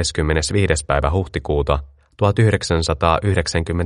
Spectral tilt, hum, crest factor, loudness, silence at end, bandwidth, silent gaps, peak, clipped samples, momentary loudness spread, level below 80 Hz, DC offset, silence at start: -5 dB/octave; none; 18 dB; -19 LUFS; 0 s; 11.5 kHz; none; 0 dBFS; under 0.1%; 5 LU; -28 dBFS; under 0.1%; 0 s